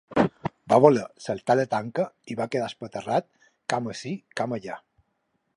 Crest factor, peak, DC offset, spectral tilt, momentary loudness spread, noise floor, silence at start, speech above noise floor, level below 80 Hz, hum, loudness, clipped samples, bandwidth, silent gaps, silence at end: 24 dB; -2 dBFS; under 0.1%; -6 dB/octave; 16 LU; -74 dBFS; 0.1 s; 49 dB; -62 dBFS; none; -26 LUFS; under 0.1%; 11.5 kHz; none; 0.8 s